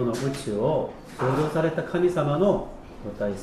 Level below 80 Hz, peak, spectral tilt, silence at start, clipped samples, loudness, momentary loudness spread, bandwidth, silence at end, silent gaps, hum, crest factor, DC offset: -46 dBFS; -10 dBFS; -7 dB/octave; 0 s; under 0.1%; -25 LUFS; 12 LU; 13.5 kHz; 0 s; none; none; 16 dB; under 0.1%